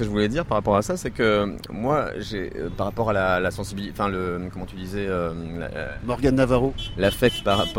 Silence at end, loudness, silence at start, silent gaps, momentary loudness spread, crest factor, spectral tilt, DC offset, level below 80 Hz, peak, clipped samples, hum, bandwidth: 0 s; -24 LUFS; 0 s; none; 11 LU; 18 dB; -6 dB/octave; under 0.1%; -38 dBFS; -4 dBFS; under 0.1%; none; 16.5 kHz